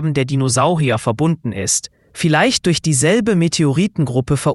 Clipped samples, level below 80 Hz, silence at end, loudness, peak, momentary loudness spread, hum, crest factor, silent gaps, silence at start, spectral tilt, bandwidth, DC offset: under 0.1%; -46 dBFS; 0 s; -16 LUFS; -2 dBFS; 5 LU; none; 14 dB; none; 0 s; -4.5 dB/octave; 12 kHz; under 0.1%